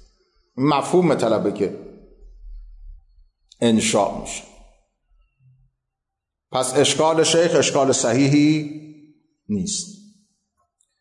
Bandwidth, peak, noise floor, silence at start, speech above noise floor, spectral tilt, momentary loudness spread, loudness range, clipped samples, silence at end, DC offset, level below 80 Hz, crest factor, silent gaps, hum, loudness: 11.5 kHz; -6 dBFS; -82 dBFS; 0.55 s; 64 dB; -4.5 dB/octave; 16 LU; 7 LU; under 0.1%; 1.1 s; under 0.1%; -50 dBFS; 16 dB; none; none; -19 LUFS